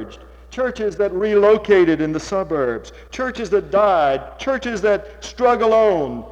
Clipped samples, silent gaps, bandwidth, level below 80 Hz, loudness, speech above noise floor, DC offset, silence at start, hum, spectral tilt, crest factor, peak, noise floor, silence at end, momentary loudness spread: under 0.1%; none; 8.6 kHz; -44 dBFS; -18 LUFS; 22 dB; under 0.1%; 0 s; none; -5.5 dB/octave; 14 dB; -4 dBFS; -39 dBFS; 0 s; 11 LU